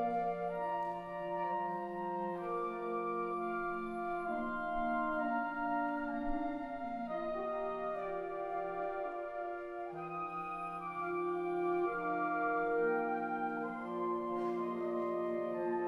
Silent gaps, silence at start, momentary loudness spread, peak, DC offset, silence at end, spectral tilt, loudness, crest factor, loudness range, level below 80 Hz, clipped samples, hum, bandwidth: none; 0 s; 6 LU; -24 dBFS; under 0.1%; 0 s; -8 dB/octave; -38 LUFS; 14 dB; 4 LU; -60 dBFS; under 0.1%; none; 11.5 kHz